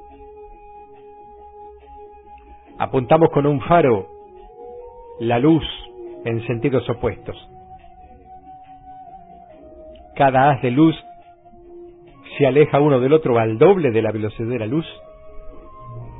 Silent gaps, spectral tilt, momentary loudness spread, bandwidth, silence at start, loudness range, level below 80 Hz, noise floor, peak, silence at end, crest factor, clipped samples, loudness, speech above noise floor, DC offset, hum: none; -12 dB/octave; 24 LU; 4 kHz; 0.2 s; 9 LU; -46 dBFS; -45 dBFS; -2 dBFS; 0 s; 18 dB; under 0.1%; -18 LUFS; 29 dB; 0.1%; none